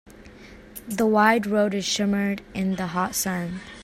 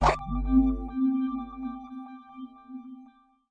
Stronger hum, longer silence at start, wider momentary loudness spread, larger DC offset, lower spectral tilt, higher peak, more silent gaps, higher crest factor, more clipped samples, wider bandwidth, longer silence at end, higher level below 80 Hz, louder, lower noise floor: neither; about the same, 0.05 s vs 0 s; second, 14 LU vs 21 LU; neither; second, -4.5 dB/octave vs -7 dB/octave; first, -4 dBFS vs -8 dBFS; neither; about the same, 20 dB vs 20 dB; neither; first, 16 kHz vs 8.8 kHz; second, 0 s vs 0.45 s; second, -54 dBFS vs -38 dBFS; first, -23 LUFS vs -28 LUFS; second, -45 dBFS vs -56 dBFS